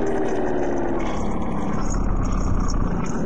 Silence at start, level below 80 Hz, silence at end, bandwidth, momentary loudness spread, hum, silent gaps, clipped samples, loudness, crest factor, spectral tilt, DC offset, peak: 0 s; -26 dBFS; 0 s; 8.2 kHz; 2 LU; none; none; under 0.1%; -25 LUFS; 14 dB; -7 dB/octave; 7%; -10 dBFS